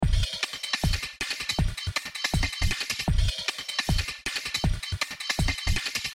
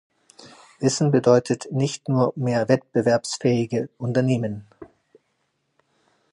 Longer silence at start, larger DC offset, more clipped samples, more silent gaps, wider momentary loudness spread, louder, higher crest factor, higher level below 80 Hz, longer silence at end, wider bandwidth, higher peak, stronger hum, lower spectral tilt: second, 0 s vs 0.45 s; neither; neither; neither; second, 3 LU vs 8 LU; second, -28 LUFS vs -22 LUFS; about the same, 16 dB vs 20 dB; first, -32 dBFS vs -62 dBFS; second, 0 s vs 1.5 s; first, 16.5 kHz vs 11 kHz; second, -12 dBFS vs -4 dBFS; neither; second, -3 dB/octave vs -6 dB/octave